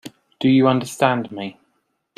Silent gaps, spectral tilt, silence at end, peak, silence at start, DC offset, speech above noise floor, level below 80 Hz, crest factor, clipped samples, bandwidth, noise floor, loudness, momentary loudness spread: none; -6 dB/octave; 0.65 s; -2 dBFS; 0.05 s; under 0.1%; 51 dB; -62 dBFS; 18 dB; under 0.1%; 13.5 kHz; -69 dBFS; -18 LUFS; 16 LU